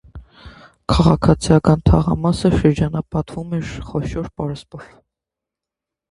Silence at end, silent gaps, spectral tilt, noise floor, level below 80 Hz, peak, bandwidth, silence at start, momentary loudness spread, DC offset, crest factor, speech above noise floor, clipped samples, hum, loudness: 1.25 s; none; -7.5 dB/octave; -86 dBFS; -30 dBFS; 0 dBFS; 11 kHz; 0.15 s; 13 LU; under 0.1%; 18 dB; 69 dB; under 0.1%; none; -18 LUFS